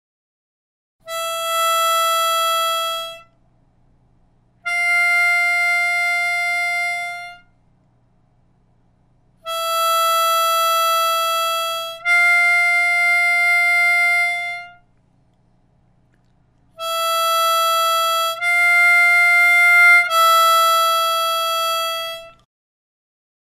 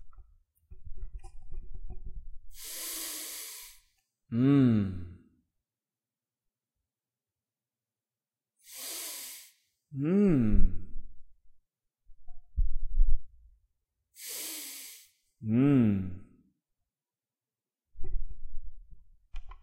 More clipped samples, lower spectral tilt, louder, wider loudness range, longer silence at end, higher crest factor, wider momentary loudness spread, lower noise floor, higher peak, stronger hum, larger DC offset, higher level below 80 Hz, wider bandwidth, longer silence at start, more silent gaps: neither; second, 2.5 dB/octave vs -6 dB/octave; first, -15 LUFS vs -30 LUFS; second, 10 LU vs 13 LU; first, 1.15 s vs 0.05 s; about the same, 16 dB vs 20 dB; second, 14 LU vs 26 LU; second, -58 dBFS vs under -90 dBFS; first, -2 dBFS vs -10 dBFS; first, 60 Hz at -60 dBFS vs none; neither; second, -62 dBFS vs -36 dBFS; about the same, 15.5 kHz vs 16 kHz; first, 1.05 s vs 0 s; neither